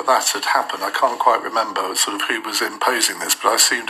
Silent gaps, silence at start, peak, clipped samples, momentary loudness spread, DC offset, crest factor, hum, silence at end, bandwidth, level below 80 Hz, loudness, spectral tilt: none; 0 s; 0 dBFS; under 0.1%; 5 LU; under 0.1%; 18 dB; none; 0 s; 15 kHz; -72 dBFS; -18 LUFS; 1 dB/octave